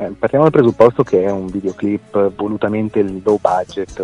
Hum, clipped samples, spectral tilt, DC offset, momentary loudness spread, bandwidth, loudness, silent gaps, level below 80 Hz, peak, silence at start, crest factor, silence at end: none; 0.3%; -8 dB/octave; under 0.1%; 9 LU; 10.5 kHz; -16 LUFS; none; -46 dBFS; 0 dBFS; 0 s; 16 dB; 0 s